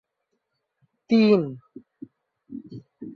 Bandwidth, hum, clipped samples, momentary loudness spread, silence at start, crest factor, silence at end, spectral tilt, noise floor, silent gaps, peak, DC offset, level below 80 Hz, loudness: 6.2 kHz; none; under 0.1%; 26 LU; 1.1 s; 20 dB; 0 s; -8 dB/octave; -78 dBFS; none; -6 dBFS; under 0.1%; -70 dBFS; -21 LUFS